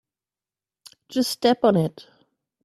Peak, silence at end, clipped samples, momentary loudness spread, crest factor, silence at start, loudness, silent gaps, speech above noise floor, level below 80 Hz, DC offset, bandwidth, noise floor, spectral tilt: -4 dBFS; 0.75 s; under 0.1%; 10 LU; 20 dB; 1.1 s; -22 LUFS; none; over 69 dB; -66 dBFS; under 0.1%; 15 kHz; under -90 dBFS; -5.5 dB/octave